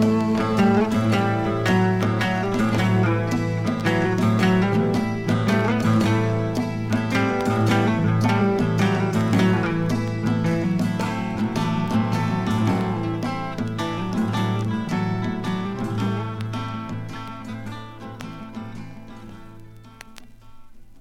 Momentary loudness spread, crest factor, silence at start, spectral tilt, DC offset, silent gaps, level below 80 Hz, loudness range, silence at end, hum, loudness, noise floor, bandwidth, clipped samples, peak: 14 LU; 14 dB; 0 s; -7 dB/octave; under 0.1%; none; -46 dBFS; 12 LU; 0 s; none; -22 LUFS; -43 dBFS; 14 kHz; under 0.1%; -8 dBFS